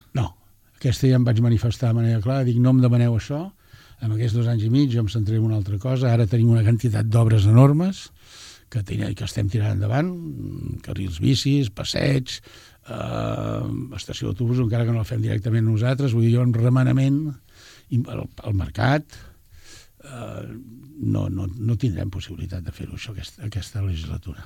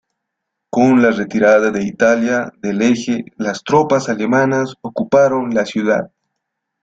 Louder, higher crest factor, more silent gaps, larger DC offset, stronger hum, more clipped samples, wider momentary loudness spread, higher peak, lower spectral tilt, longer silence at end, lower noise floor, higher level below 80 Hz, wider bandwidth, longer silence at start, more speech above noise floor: second, -22 LUFS vs -15 LUFS; first, 20 dB vs 14 dB; neither; neither; neither; neither; first, 15 LU vs 10 LU; about the same, -2 dBFS vs -2 dBFS; first, -7.5 dB/octave vs -6 dB/octave; second, 0 s vs 0.8 s; second, -54 dBFS vs -77 dBFS; first, -44 dBFS vs -56 dBFS; first, 10.5 kHz vs 7.8 kHz; second, 0.15 s vs 0.75 s; second, 33 dB vs 63 dB